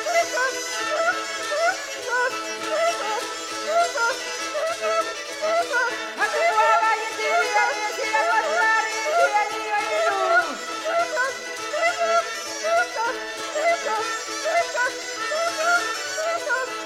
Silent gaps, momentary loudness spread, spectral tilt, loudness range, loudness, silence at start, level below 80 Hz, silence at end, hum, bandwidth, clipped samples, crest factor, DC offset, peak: none; 7 LU; 0 dB/octave; 3 LU; -23 LUFS; 0 s; -68 dBFS; 0 s; none; 16.5 kHz; under 0.1%; 16 dB; under 0.1%; -6 dBFS